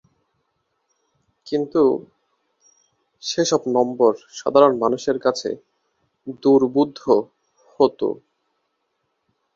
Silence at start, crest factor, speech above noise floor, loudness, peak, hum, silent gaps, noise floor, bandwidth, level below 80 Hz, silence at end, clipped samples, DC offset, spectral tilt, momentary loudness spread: 1.45 s; 20 dB; 54 dB; -20 LUFS; -2 dBFS; none; none; -73 dBFS; 7.6 kHz; -66 dBFS; 1.4 s; under 0.1%; under 0.1%; -5 dB/octave; 15 LU